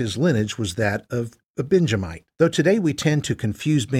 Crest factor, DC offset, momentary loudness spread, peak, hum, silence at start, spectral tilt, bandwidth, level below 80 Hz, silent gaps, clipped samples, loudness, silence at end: 16 dB; under 0.1%; 10 LU; -4 dBFS; none; 0 s; -6 dB/octave; 15 kHz; -50 dBFS; 1.50-1.54 s; under 0.1%; -22 LUFS; 0 s